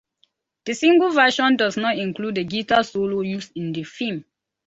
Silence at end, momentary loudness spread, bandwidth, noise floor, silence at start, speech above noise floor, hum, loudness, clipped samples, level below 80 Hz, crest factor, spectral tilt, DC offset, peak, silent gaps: 0.45 s; 13 LU; 8 kHz; -66 dBFS; 0.65 s; 46 dB; none; -20 LUFS; under 0.1%; -62 dBFS; 18 dB; -4.5 dB/octave; under 0.1%; -4 dBFS; none